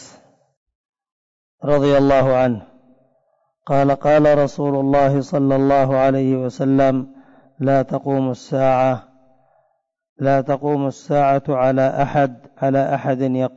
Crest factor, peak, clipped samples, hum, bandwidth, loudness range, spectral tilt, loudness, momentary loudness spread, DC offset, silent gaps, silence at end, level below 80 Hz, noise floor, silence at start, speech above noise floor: 12 dB; -8 dBFS; under 0.1%; none; 7.8 kHz; 4 LU; -8 dB/octave; -17 LUFS; 8 LU; under 0.1%; 0.57-0.66 s, 0.75-0.93 s, 1.12-1.58 s, 10.09-10.16 s; 0.05 s; -46 dBFS; -65 dBFS; 0 s; 49 dB